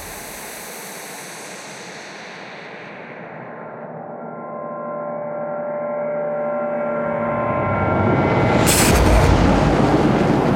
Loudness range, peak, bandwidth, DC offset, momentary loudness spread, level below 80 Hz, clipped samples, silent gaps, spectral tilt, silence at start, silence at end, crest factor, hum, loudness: 17 LU; -2 dBFS; 16.5 kHz; under 0.1%; 19 LU; -30 dBFS; under 0.1%; none; -5 dB/octave; 0 s; 0 s; 18 dB; none; -18 LUFS